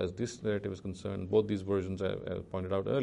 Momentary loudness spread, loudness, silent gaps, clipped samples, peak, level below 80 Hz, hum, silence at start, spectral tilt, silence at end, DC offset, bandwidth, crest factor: 9 LU; -34 LUFS; none; under 0.1%; -16 dBFS; -60 dBFS; none; 0 s; -7 dB/octave; 0 s; under 0.1%; 11 kHz; 18 dB